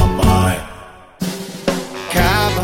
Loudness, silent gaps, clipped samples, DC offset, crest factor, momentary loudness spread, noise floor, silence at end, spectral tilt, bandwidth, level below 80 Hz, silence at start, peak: -18 LUFS; none; under 0.1%; under 0.1%; 16 dB; 12 LU; -38 dBFS; 0 s; -5 dB/octave; 16.5 kHz; -26 dBFS; 0 s; 0 dBFS